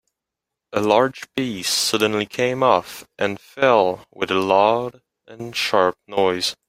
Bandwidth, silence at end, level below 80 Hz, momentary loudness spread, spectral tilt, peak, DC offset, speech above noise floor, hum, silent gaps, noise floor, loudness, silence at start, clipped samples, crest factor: 16 kHz; 0.15 s; -62 dBFS; 10 LU; -3.5 dB/octave; -2 dBFS; under 0.1%; 64 dB; none; none; -84 dBFS; -20 LUFS; 0.75 s; under 0.1%; 20 dB